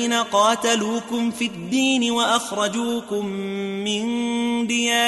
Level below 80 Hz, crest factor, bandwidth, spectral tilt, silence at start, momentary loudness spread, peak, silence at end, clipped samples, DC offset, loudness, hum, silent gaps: -64 dBFS; 16 dB; 12 kHz; -3 dB/octave; 0 s; 8 LU; -6 dBFS; 0 s; under 0.1%; under 0.1%; -21 LUFS; none; none